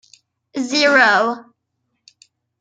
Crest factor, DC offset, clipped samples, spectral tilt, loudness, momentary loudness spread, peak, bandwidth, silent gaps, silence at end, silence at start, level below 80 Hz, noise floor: 18 dB; under 0.1%; under 0.1%; -2 dB/octave; -15 LUFS; 19 LU; -2 dBFS; 9.4 kHz; none; 1.2 s; 0.55 s; -74 dBFS; -73 dBFS